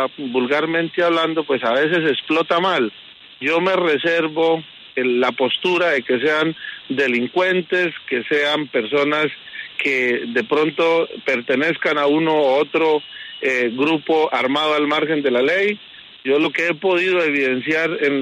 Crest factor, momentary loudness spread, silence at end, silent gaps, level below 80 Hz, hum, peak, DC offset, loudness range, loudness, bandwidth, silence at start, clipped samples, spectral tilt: 14 dB; 6 LU; 0 s; none; -70 dBFS; none; -6 dBFS; under 0.1%; 1 LU; -18 LUFS; 10.5 kHz; 0 s; under 0.1%; -5 dB/octave